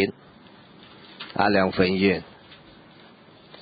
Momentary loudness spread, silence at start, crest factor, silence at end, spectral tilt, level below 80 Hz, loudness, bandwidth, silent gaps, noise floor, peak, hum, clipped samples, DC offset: 22 LU; 0 s; 20 dB; 1.1 s; -10.5 dB/octave; -52 dBFS; -23 LUFS; 5 kHz; none; -50 dBFS; -6 dBFS; none; under 0.1%; under 0.1%